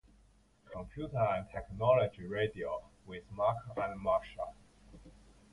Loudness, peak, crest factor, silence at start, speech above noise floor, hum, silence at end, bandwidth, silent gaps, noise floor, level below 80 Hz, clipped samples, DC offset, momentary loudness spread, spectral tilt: -35 LUFS; -16 dBFS; 20 dB; 0.65 s; 31 dB; none; 0.4 s; 11 kHz; none; -66 dBFS; -58 dBFS; under 0.1%; under 0.1%; 18 LU; -7.5 dB/octave